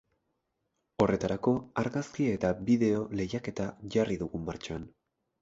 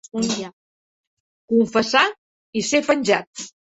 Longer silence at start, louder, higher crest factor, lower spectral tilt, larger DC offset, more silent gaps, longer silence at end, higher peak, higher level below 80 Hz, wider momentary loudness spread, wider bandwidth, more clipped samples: first, 1 s vs 0.15 s; second, -31 LUFS vs -20 LUFS; about the same, 20 dB vs 20 dB; first, -7 dB/octave vs -3 dB/octave; neither; second, none vs 0.53-1.48 s, 2.18-2.53 s, 3.27-3.33 s; first, 0.55 s vs 0.25 s; second, -12 dBFS vs -2 dBFS; first, -56 dBFS vs -62 dBFS; about the same, 12 LU vs 14 LU; about the same, 7.8 kHz vs 8.2 kHz; neither